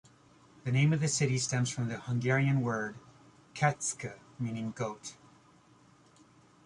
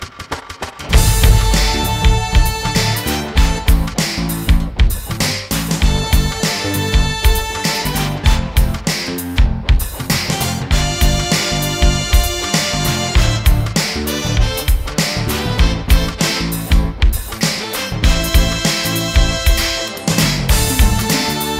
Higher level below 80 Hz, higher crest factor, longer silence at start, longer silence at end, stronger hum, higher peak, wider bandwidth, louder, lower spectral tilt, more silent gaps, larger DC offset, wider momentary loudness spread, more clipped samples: second, -68 dBFS vs -16 dBFS; first, 20 dB vs 14 dB; first, 0.65 s vs 0 s; first, 1.55 s vs 0 s; neither; second, -14 dBFS vs 0 dBFS; second, 11.5 kHz vs 16.5 kHz; second, -32 LUFS vs -16 LUFS; about the same, -5 dB/octave vs -4 dB/octave; neither; neither; first, 15 LU vs 4 LU; neither